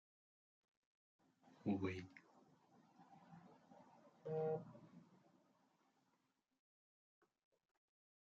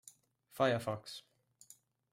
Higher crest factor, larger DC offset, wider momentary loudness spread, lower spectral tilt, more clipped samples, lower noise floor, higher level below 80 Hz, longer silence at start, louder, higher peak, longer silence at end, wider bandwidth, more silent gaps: about the same, 22 dB vs 22 dB; neither; about the same, 24 LU vs 24 LU; first, -7 dB/octave vs -5 dB/octave; neither; first, -86 dBFS vs -65 dBFS; second, under -90 dBFS vs -78 dBFS; first, 1.65 s vs 0.55 s; second, -47 LUFS vs -36 LUFS; second, -30 dBFS vs -18 dBFS; first, 3.25 s vs 0.9 s; second, 7.4 kHz vs 16 kHz; neither